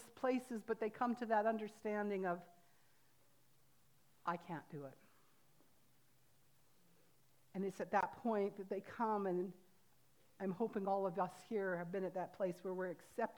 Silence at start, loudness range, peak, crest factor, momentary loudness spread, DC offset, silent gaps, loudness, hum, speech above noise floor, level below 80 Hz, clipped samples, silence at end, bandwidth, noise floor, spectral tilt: 0 s; 10 LU; -22 dBFS; 22 dB; 9 LU; under 0.1%; none; -42 LUFS; none; 34 dB; -88 dBFS; under 0.1%; 0 s; over 20 kHz; -75 dBFS; -7 dB/octave